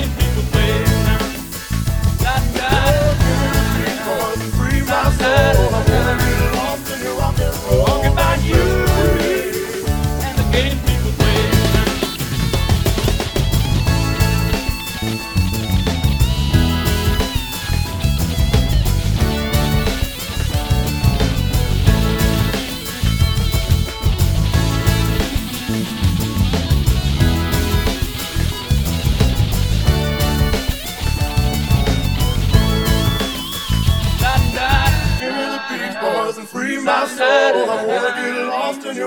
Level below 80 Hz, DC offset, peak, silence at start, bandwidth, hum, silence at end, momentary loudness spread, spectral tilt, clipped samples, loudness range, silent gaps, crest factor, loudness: -22 dBFS; under 0.1%; 0 dBFS; 0 s; over 20 kHz; none; 0 s; 6 LU; -5 dB/octave; under 0.1%; 2 LU; none; 16 dB; -17 LUFS